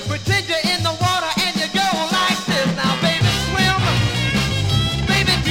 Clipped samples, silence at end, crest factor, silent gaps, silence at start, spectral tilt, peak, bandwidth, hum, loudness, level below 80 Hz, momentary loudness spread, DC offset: under 0.1%; 0 s; 14 dB; none; 0 s; -4 dB/octave; -4 dBFS; 16.5 kHz; none; -18 LUFS; -34 dBFS; 3 LU; under 0.1%